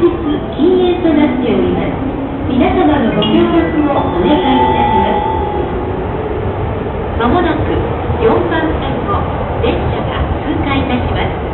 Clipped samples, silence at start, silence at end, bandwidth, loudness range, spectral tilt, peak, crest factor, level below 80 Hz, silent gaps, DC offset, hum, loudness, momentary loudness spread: under 0.1%; 0 s; 0 s; 4.2 kHz; 3 LU; -12.5 dB/octave; -2 dBFS; 10 dB; -24 dBFS; none; under 0.1%; none; -14 LUFS; 7 LU